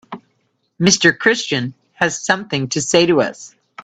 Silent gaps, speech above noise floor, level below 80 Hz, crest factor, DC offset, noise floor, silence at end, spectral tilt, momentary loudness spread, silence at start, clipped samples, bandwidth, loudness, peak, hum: none; 50 dB; -56 dBFS; 18 dB; under 0.1%; -66 dBFS; 0 s; -3.5 dB/octave; 23 LU; 0.1 s; under 0.1%; 9.4 kHz; -16 LUFS; 0 dBFS; none